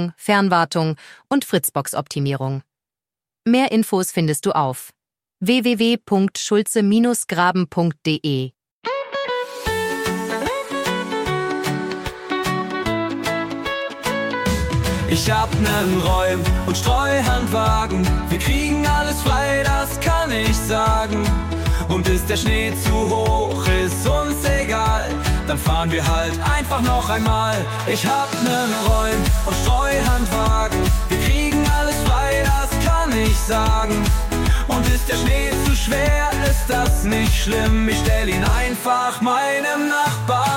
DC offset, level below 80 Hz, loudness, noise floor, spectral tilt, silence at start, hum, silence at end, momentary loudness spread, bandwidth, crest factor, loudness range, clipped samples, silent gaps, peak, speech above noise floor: under 0.1%; -24 dBFS; -19 LUFS; under -90 dBFS; -5 dB/octave; 0 s; none; 0 s; 5 LU; 17 kHz; 16 dB; 4 LU; under 0.1%; 8.71-8.82 s; -2 dBFS; over 72 dB